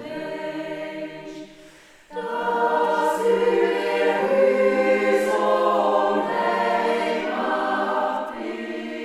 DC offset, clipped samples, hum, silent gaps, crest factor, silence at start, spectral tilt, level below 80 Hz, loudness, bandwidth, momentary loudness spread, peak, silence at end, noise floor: under 0.1%; under 0.1%; none; none; 16 dB; 0 s; -5 dB/octave; -64 dBFS; -22 LUFS; 14.5 kHz; 12 LU; -6 dBFS; 0 s; -48 dBFS